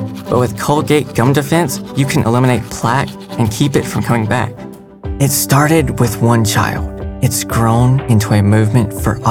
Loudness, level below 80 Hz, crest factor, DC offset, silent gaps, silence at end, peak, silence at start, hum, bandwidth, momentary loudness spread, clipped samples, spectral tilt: -14 LUFS; -32 dBFS; 12 dB; 0.1%; none; 0 s; 0 dBFS; 0 s; none; 18 kHz; 7 LU; under 0.1%; -5.5 dB/octave